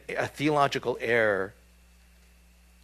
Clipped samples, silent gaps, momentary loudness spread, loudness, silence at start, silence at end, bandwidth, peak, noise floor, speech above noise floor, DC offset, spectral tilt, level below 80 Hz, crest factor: under 0.1%; none; 8 LU; -27 LUFS; 0.1 s; 1.35 s; 14.5 kHz; -8 dBFS; -57 dBFS; 31 dB; under 0.1%; -5 dB/octave; -58 dBFS; 20 dB